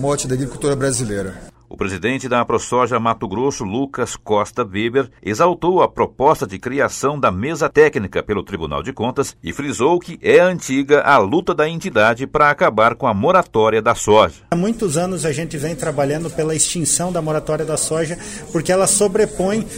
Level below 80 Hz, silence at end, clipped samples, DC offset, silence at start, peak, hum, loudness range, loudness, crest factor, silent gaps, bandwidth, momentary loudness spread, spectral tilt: -44 dBFS; 0 s; under 0.1%; under 0.1%; 0 s; 0 dBFS; none; 5 LU; -17 LUFS; 16 dB; none; 16 kHz; 9 LU; -4.5 dB/octave